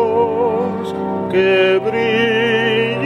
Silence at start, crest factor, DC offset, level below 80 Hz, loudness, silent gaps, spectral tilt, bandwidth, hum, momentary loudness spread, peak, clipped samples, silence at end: 0 s; 12 dB; under 0.1%; -54 dBFS; -16 LUFS; none; -6 dB/octave; 10.5 kHz; none; 8 LU; -2 dBFS; under 0.1%; 0 s